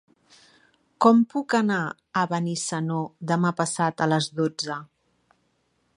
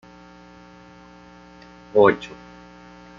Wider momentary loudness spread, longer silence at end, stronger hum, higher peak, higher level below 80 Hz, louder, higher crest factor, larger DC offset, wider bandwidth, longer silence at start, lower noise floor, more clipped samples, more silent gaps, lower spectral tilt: second, 10 LU vs 28 LU; first, 1.1 s vs 0.9 s; second, none vs 60 Hz at -50 dBFS; about the same, -4 dBFS vs -2 dBFS; second, -72 dBFS vs -58 dBFS; second, -24 LUFS vs -19 LUFS; about the same, 22 dB vs 24 dB; neither; first, 11 kHz vs 7.4 kHz; second, 1 s vs 1.95 s; first, -70 dBFS vs -46 dBFS; neither; neither; second, -5 dB/octave vs -6.5 dB/octave